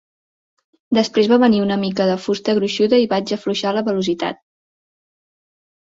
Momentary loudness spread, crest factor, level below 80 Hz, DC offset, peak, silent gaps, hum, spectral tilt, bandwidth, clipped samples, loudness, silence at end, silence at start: 8 LU; 16 dB; -60 dBFS; under 0.1%; -2 dBFS; none; none; -5.5 dB/octave; 7.8 kHz; under 0.1%; -18 LUFS; 1.5 s; 0.9 s